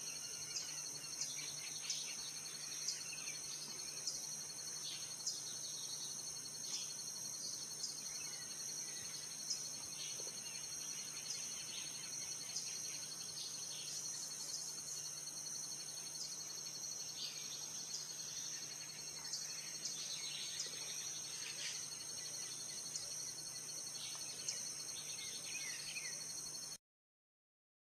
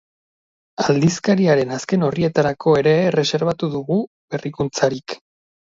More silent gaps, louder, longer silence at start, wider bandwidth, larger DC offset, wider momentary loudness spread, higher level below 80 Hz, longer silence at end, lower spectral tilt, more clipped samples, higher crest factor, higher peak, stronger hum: second, none vs 4.07-4.28 s; second, -43 LUFS vs -19 LUFS; second, 0 s vs 0.8 s; first, 14 kHz vs 7.8 kHz; neither; second, 3 LU vs 12 LU; second, -84 dBFS vs -54 dBFS; first, 1.05 s vs 0.6 s; second, 0.5 dB/octave vs -6 dB/octave; neither; about the same, 20 dB vs 16 dB; second, -26 dBFS vs -2 dBFS; neither